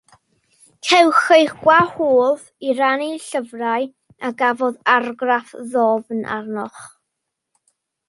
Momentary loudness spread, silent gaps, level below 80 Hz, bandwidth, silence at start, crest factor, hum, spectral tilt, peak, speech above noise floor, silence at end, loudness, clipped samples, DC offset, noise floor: 14 LU; none; -64 dBFS; 11.5 kHz; 0.85 s; 18 dB; none; -3.5 dB/octave; 0 dBFS; 61 dB; 1.2 s; -18 LUFS; under 0.1%; under 0.1%; -79 dBFS